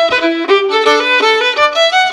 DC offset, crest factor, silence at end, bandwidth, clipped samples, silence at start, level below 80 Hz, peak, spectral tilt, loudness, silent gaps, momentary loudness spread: under 0.1%; 12 dB; 0 s; 12.5 kHz; under 0.1%; 0 s; -56 dBFS; 0 dBFS; -1 dB/octave; -10 LUFS; none; 3 LU